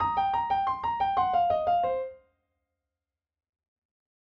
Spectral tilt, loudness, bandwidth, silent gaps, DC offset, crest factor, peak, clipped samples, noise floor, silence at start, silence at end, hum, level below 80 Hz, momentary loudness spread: -6.5 dB/octave; -27 LUFS; 6 kHz; none; under 0.1%; 16 dB; -14 dBFS; under 0.1%; -90 dBFS; 0 s; 2.2 s; none; -58 dBFS; 5 LU